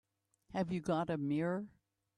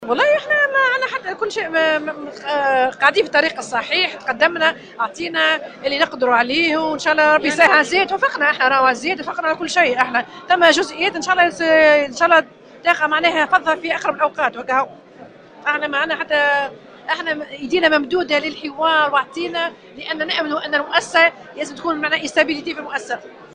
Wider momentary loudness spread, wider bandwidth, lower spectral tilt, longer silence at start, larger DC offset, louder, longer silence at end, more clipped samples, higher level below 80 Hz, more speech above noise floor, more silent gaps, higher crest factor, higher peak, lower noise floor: second, 8 LU vs 11 LU; about the same, 11 kHz vs 10 kHz; first, -7.5 dB/octave vs -2.5 dB/octave; first, 0.5 s vs 0 s; neither; second, -38 LUFS vs -17 LUFS; first, 0.5 s vs 0.1 s; neither; second, -70 dBFS vs -58 dBFS; first, 32 dB vs 24 dB; neither; about the same, 16 dB vs 18 dB; second, -22 dBFS vs 0 dBFS; first, -68 dBFS vs -42 dBFS